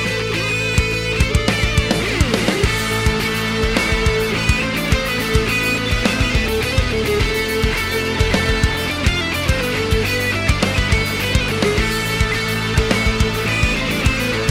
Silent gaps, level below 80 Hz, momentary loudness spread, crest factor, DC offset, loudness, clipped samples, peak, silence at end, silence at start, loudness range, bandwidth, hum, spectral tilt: none; -24 dBFS; 2 LU; 16 dB; under 0.1%; -17 LUFS; under 0.1%; -2 dBFS; 0 s; 0 s; 1 LU; 17 kHz; none; -4.5 dB/octave